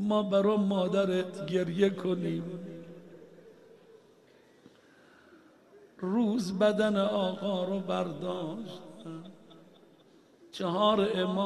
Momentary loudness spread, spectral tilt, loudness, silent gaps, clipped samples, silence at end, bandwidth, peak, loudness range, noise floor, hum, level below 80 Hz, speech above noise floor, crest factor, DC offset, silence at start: 19 LU; -6.5 dB/octave; -30 LUFS; none; under 0.1%; 0 s; 12 kHz; -12 dBFS; 9 LU; -60 dBFS; none; -72 dBFS; 31 dB; 18 dB; under 0.1%; 0 s